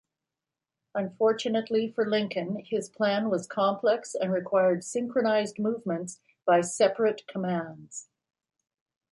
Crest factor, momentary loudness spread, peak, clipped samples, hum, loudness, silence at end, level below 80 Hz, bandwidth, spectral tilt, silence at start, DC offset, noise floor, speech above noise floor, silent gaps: 18 dB; 9 LU; -10 dBFS; under 0.1%; none; -28 LUFS; 1.1 s; -76 dBFS; 11.5 kHz; -5 dB/octave; 0.95 s; under 0.1%; -89 dBFS; 62 dB; none